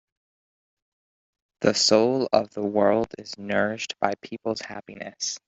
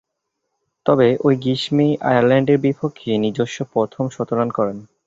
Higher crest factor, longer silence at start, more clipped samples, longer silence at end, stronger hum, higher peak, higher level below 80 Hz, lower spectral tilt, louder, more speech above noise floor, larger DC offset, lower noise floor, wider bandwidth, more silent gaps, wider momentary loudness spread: first, 22 dB vs 16 dB; first, 1.6 s vs 0.85 s; neither; about the same, 0.1 s vs 0.2 s; neither; about the same, -4 dBFS vs -2 dBFS; second, -64 dBFS vs -58 dBFS; second, -3.5 dB/octave vs -7 dB/octave; second, -24 LUFS vs -18 LUFS; first, over 66 dB vs 59 dB; neither; first, under -90 dBFS vs -76 dBFS; about the same, 8.2 kHz vs 8 kHz; neither; first, 15 LU vs 9 LU